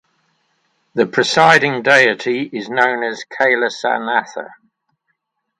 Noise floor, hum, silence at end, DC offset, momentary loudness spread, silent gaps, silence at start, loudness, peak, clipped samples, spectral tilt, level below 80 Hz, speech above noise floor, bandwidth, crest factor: -71 dBFS; none; 1.05 s; under 0.1%; 13 LU; none; 0.95 s; -15 LUFS; 0 dBFS; under 0.1%; -3.5 dB/octave; -64 dBFS; 55 dB; 11.5 kHz; 18 dB